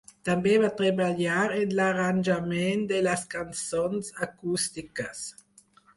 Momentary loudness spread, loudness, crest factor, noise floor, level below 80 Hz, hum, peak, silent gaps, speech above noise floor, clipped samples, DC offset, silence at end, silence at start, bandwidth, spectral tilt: 11 LU; -27 LUFS; 16 dB; -59 dBFS; -62 dBFS; none; -12 dBFS; none; 32 dB; under 0.1%; under 0.1%; 0.65 s; 0.25 s; 11.5 kHz; -5 dB/octave